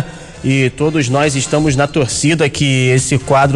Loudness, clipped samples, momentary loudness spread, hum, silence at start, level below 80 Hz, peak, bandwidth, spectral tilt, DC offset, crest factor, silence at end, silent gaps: -13 LUFS; under 0.1%; 3 LU; none; 0 s; -38 dBFS; -2 dBFS; 11.5 kHz; -5 dB/octave; under 0.1%; 12 dB; 0 s; none